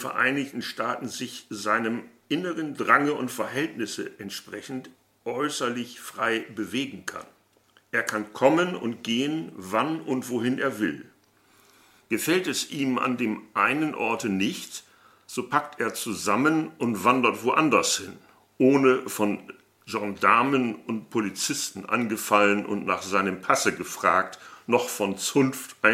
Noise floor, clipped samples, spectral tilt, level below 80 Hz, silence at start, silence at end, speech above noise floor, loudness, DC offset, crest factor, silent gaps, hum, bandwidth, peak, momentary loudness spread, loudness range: -62 dBFS; under 0.1%; -4 dB/octave; -72 dBFS; 0 s; 0 s; 37 dB; -25 LUFS; under 0.1%; 24 dB; none; none; 16.5 kHz; -4 dBFS; 14 LU; 6 LU